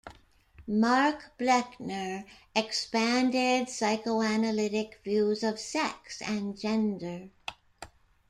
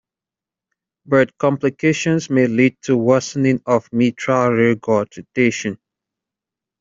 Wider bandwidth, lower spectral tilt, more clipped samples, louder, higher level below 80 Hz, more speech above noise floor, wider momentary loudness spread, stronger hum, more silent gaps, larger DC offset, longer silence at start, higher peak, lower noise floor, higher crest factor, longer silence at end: first, 12.5 kHz vs 7.6 kHz; second, -4 dB/octave vs -6 dB/octave; neither; second, -29 LUFS vs -17 LUFS; second, -64 dBFS vs -58 dBFS; second, 28 dB vs 72 dB; first, 16 LU vs 4 LU; neither; neither; neither; second, 0.05 s vs 1.1 s; second, -10 dBFS vs -2 dBFS; second, -57 dBFS vs -88 dBFS; about the same, 20 dB vs 16 dB; second, 0.45 s vs 1.05 s